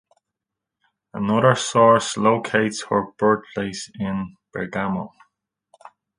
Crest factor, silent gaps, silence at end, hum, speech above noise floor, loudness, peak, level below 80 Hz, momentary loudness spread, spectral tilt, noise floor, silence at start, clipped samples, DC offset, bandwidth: 22 dB; none; 1.1 s; none; 64 dB; -21 LUFS; 0 dBFS; -58 dBFS; 14 LU; -5 dB/octave; -85 dBFS; 1.15 s; under 0.1%; under 0.1%; 10.5 kHz